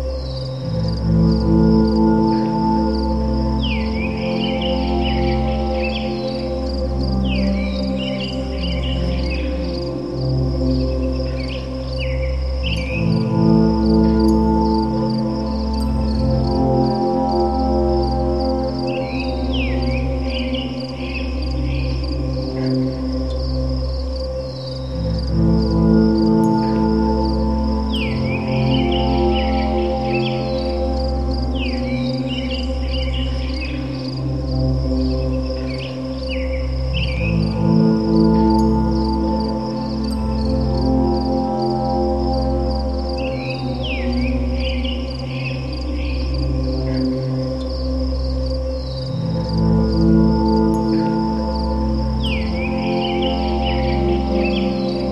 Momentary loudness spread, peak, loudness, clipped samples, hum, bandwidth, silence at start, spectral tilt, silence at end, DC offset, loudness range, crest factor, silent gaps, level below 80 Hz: 8 LU; -2 dBFS; -19 LUFS; under 0.1%; none; 8.8 kHz; 0 s; -8 dB/octave; 0 s; 0.5%; 5 LU; 16 dB; none; -24 dBFS